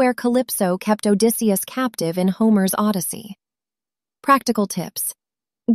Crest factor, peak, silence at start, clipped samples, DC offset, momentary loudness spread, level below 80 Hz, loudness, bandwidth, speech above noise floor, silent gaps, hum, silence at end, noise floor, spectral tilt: 18 dB; -2 dBFS; 0 s; under 0.1%; under 0.1%; 10 LU; -64 dBFS; -20 LUFS; 15.5 kHz; over 71 dB; none; none; 0 s; under -90 dBFS; -5 dB/octave